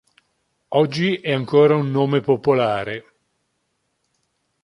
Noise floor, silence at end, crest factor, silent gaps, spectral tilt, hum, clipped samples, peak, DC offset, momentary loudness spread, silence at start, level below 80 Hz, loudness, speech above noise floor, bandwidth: -72 dBFS; 1.65 s; 18 dB; none; -7.5 dB/octave; none; under 0.1%; -2 dBFS; under 0.1%; 9 LU; 0.7 s; -60 dBFS; -19 LUFS; 54 dB; 10.5 kHz